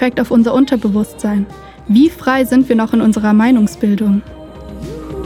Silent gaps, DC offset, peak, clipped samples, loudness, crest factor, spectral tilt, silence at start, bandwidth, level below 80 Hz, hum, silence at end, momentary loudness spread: none; under 0.1%; 0 dBFS; under 0.1%; -13 LUFS; 14 dB; -6.5 dB/octave; 0 s; 15 kHz; -38 dBFS; none; 0 s; 17 LU